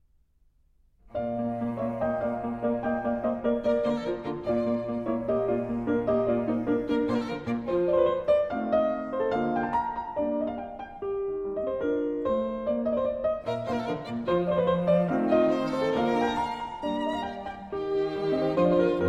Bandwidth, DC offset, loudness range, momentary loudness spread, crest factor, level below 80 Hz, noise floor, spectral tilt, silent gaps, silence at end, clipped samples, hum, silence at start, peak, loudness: 9.2 kHz; under 0.1%; 4 LU; 8 LU; 16 dB; -54 dBFS; -64 dBFS; -8 dB/octave; none; 0 s; under 0.1%; none; 1.1 s; -12 dBFS; -28 LUFS